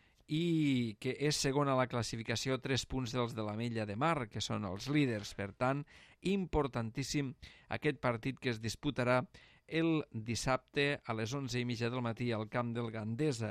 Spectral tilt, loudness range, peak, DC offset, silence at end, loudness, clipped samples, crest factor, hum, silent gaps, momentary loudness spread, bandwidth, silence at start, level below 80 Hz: -5.5 dB/octave; 2 LU; -18 dBFS; under 0.1%; 0 s; -36 LUFS; under 0.1%; 18 dB; none; none; 7 LU; 14 kHz; 0.3 s; -58 dBFS